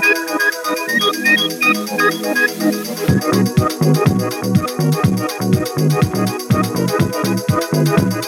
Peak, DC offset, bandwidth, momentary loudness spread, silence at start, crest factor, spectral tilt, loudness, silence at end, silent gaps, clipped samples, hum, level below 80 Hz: -2 dBFS; under 0.1%; 18.5 kHz; 4 LU; 0 s; 14 dB; -5 dB/octave; -16 LUFS; 0 s; none; under 0.1%; none; -46 dBFS